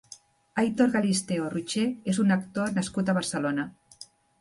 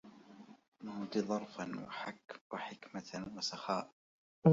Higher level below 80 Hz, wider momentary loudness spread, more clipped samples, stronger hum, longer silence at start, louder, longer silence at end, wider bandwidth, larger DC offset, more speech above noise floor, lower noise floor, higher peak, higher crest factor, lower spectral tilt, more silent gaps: first, -64 dBFS vs -76 dBFS; second, 16 LU vs 21 LU; neither; neither; about the same, 0.1 s vs 0.05 s; first, -27 LUFS vs -41 LUFS; first, 0.35 s vs 0 s; first, 11.5 kHz vs 7.6 kHz; neither; first, 26 dB vs 16 dB; second, -52 dBFS vs -58 dBFS; first, -10 dBFS vs -14 dBFS; second, 16 dB vs 24 dB; about the same, -5 dB/octave vs -5.5 dB/octave; second, none vs 0.68-0.72 s, 2.41-2.50 s, 3.92-4.42 s